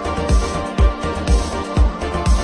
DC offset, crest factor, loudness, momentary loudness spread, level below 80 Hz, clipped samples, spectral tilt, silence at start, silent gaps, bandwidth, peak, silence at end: under 0.1%; 14 dB; -19 LUFS; 3 LU; -18 dBFS; under 0.1%; -6 dB/octave; 0 s; none; 10.5 kHz; -2 dBFS; 0 s